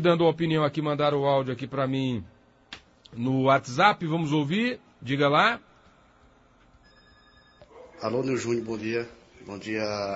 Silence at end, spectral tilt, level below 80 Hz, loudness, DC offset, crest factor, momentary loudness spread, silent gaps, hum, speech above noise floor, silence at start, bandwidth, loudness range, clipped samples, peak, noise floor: 0 s; -6 dB/octave; -62 dBFS; -26 LUFS; under 0.1%; 22 dB; 17 LU; none; none; 33 dB; 0 s; 8 kHz; 8 LU; under 0.1%; -6 dBFS; -58 dBFS